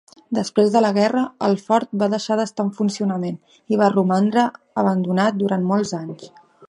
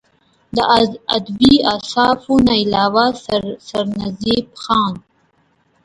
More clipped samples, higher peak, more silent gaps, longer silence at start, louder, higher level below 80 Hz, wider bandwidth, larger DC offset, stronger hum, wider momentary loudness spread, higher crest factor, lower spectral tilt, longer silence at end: neither; about the same, -2 dBFS vs 0 dBFS; neither; second, 0.3 s vs 0.55 s; second, -20 LUFS vs -16 LUFS; second, -68 dBFS vs -44 dBFS; about the same, 11 kHz vs 11.5 kHz; neither; neither; about the same, 10 LU vs 10 LU; about the same, 18 dB vs 16 dB; first, -6.5 dB/octave vs -5 dB/octave; second, 0.05 s vs 0.85 s